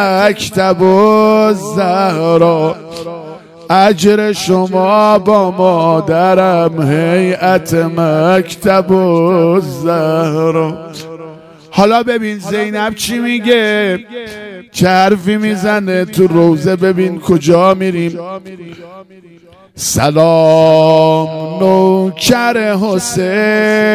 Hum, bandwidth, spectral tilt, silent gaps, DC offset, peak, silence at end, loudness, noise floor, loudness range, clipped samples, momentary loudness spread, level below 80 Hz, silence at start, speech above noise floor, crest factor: none; 16 kHz; -5.5 dB/octave; none; under 0.1%; 0 dBFS; 0 s; -11 LUFS; -33 dBFS; 4 LU; 0.3%; 12 LU; -46 dBFS; 0 s; 22 dB; 10 dB